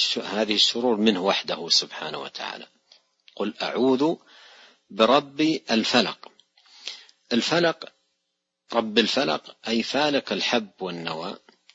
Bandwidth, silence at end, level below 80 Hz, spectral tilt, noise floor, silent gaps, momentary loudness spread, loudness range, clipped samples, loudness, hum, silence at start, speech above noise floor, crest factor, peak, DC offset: 8 kHz; 0.35 s; -72 dBFS; -3.5 dB/octave; -79 dBFS; none; 17 LU; 3 LU; under 0.1%; -23 LUFS; none; 0 s; 55 dB; 22 dB; -4 dBFS; under 0.1%